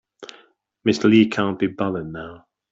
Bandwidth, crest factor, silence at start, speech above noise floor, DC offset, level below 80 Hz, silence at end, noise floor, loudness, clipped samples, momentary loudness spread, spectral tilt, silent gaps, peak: 7.8 kHz; 18 dB; 0.2 s; 37 dB; under 0.1%; -58 dBFS; 0.35 s; -56 dBFS; -20 LUFS; under 0.1%; 26 LU; -6 dB/octave; none; -4 dBFS